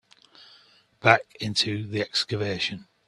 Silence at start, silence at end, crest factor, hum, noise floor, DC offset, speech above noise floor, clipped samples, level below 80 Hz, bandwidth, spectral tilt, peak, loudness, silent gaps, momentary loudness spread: 1.05 s; 0.25 s; 26 dB; none; -58 dBFS; under 0.1%; 32 dB; under 0.1%; -64 dBFS; 12.5 kHz; -4 dB/octave; 0 dBFS; -25 LUFS; none; 9 LU